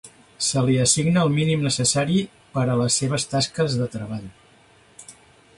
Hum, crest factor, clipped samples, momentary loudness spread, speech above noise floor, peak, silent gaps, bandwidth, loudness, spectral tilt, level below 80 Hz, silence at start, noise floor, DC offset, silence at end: none; 18 dB; under 0.1%; 10 LU; 33 dB; -6 dBFS; none; 11.5 kHz; -21 LUFS; -4.5 dB/octave; -54 dBFS; 0.05 s; -54 dBFS; under 0.1%; 0.45 s